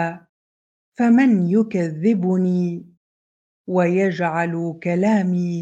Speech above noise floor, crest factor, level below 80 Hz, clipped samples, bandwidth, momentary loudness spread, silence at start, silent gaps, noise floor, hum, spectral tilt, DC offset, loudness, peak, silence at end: over 72 dB; 14 dB; -68 dBFS; under 0.1%; 8 kHz; 10 LU; 0 s; 0.29-0.92 s, 2.97-3.64 s; under -90 dBFS; none; -8.5 dB/octave; under 0.1%; -19 LUFS; -6 dBFS; 0 s